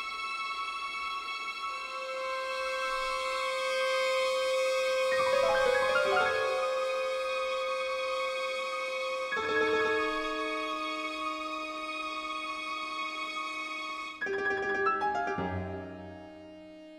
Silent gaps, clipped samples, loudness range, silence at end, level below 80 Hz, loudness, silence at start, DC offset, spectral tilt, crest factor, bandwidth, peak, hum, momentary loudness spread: none; under 0.1%; 6 LU; 0 s; -62 dBFS; -31 LUFS; 0 s; under 0.1%; -3 dB/octave; 18 dB; 15.5 kHz; -14 dBFS; none; 9 LU